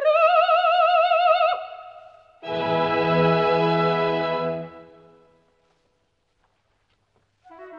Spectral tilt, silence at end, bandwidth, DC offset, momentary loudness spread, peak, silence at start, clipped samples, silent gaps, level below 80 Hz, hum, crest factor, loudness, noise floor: -7.5 dB/octave; 0 s; 7 kHz; under 0.1%; 15 LU; -8 dBFS; 0 s; under 0.1%; none; -60 dBFS; none; 16 dB; -20 LUFS; -70 dBFS